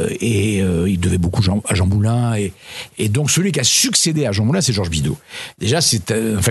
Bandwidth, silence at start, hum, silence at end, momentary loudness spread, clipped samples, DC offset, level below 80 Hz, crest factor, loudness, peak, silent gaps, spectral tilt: 12.5 kHz; 0 s; none; 0 s; 10 LU; under 0.1%; under 0.1%; -38 dBFS; 16 dB; -17 LUFS; 0 dBFS; none; -4 dB/octave